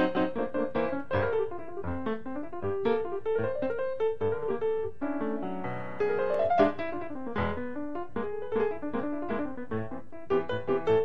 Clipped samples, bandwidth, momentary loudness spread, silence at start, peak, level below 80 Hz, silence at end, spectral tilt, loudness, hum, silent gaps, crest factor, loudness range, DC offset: under 0.1%; 6.4 kHz; 9 LU; 0 s; -10 dBFS; -56 dBFS; 0 s; -8.5 dB/octave; -31 LUFS; none; none; 20 dB; 3 LU; 1%